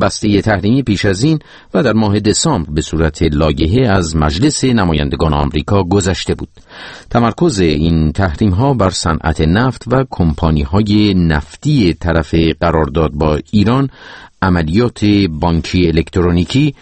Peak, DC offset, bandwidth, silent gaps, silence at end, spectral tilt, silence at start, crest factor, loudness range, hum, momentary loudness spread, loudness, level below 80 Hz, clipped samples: 0 dBFS; under 0.1%; 8.8 kHz; none; 0.1 s; -6 dB/octave; 0 s; 12 dB; 1 LU; none; 4 LU; -13 LUFS; -26 dBFS; under 0.1%